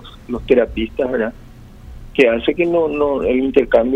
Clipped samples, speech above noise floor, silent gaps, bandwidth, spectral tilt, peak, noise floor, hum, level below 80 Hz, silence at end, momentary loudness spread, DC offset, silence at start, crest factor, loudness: under 0.1%; 22 dB; none; 8.4 kHz; -7 dB/octave; 0 dBFS; -38 dBFS; none; -36 dBFS; 0 s; 10 LU; under 0.1%; 0 s; 16 dB; -17 LUFS